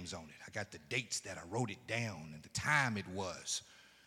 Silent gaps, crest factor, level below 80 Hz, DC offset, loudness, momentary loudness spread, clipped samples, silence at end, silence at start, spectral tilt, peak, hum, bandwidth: none; 24 dB; -72 dBFS; under 0.1%; -39 LUFS; 13 LU; under 0.1%; 0.15 s; 0 s; -3 dB/octave; -16 dBFS; none; 16 kHz